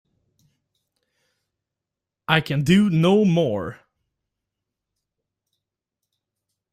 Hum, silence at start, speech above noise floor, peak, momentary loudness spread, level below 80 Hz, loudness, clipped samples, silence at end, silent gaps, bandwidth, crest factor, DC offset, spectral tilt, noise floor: none; 2.3 s; 68 dB; -2 dBFS; 14 LU; -58 dBFS; -19 LUFS; under 0.1%; 3 s; none; 14 kHz; 22 dB; under 0.1%; -6.5 dB/octave; -86 dBFS